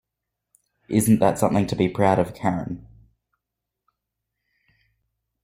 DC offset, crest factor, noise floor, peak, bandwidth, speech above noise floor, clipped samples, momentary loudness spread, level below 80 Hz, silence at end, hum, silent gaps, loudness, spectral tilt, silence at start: under 0.1%; 22 dB; -84 dBFS; -4 dBFS; 16 kHz; 63 dB; under 0.1%; 11 LU; -54 dBFS; 2.65 s; none; none; -21 LUFS; -6.5 dB/octave; 0.9 s